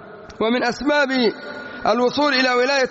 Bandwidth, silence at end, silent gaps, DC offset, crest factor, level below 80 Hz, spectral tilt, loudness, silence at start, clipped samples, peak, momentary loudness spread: 8 kHz; 0 s; none; under 0.1%; 14 dB; -54 dBFS; -1 dB/octave; -19 LUFS; 0 s; under 0.1%; -6 dBFS; 12 LU